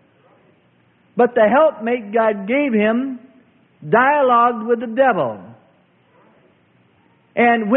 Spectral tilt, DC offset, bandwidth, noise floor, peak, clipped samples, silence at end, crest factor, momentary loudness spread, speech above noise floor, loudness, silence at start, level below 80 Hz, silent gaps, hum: -11 dB/octave; under 0.1%; 4 kHz; -57 dBFS; -2 dBFS; under 0.1%; 0 s; 16 dB; 14 LU; 41 dB; -17 LUFS; 1.15 s; -66 dBFS; none; none